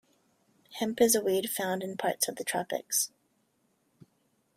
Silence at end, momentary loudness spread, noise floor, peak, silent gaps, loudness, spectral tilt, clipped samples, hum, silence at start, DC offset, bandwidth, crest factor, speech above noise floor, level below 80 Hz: 1.5 s; 10 LU; -73 dBFS; -10 dBFS; none; -29 LUFS; -2.5 dB/octave; under 0.1%; none; 0.7 s; under 0.1%; 16 kHz; 22 dB; 44 dB; -74 dBFS